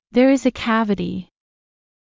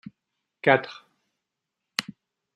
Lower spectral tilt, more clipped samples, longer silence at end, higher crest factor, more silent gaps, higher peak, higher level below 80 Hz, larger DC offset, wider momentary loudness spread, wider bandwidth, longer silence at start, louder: first, -6 dB/octave vs -4.5 dB/octave; neither; first, 0.9 s vs 0.55 s; second, 16 dB vs 26 dB; neither; about the same, -4 dBFS vs -4 dBFS; first, -50 dBFS vs -76 dBFS; neither; second, 12 LU vs 20 LU; second, 7.6 kHz vs 14 kHz; second, 0.15 s vs 0.65 s; first, -19 LUFS vs -25 LUFS